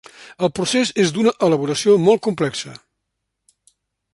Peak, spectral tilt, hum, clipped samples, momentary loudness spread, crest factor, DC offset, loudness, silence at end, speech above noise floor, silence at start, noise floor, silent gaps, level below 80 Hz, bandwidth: -2 dBFS; -4.5 dB/octave; none; under 0.1%; 9 LU; 18 dB; under 0.1%; -18 LUFS; 1.4 s; 60 dB; 0.2 s; -77 dBFS; none; -60 dBFS; 11.5 kHz